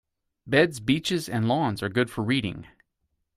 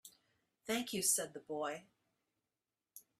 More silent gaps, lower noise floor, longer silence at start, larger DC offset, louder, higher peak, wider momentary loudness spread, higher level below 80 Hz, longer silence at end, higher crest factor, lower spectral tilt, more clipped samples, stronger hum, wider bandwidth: neither; second, -77 dBFS vs under -90 dBFS; first, 0.45 s vs 0.05 s; neither; first, -25 LUFS vs -37 LUFS; first, -6 dBFS vs -20 dBFS; second, 5 LU vs 15 LU; first, -58 dBFS vs -84 dBFS; first, 0.75 s vs 0.2 s; about the same, 20 dB vs 24 dB; first, -5.5 dB/octave vs -1.5 dB/octave; neither; neither; about the same, 15.5 kHz vs 15.5 kHz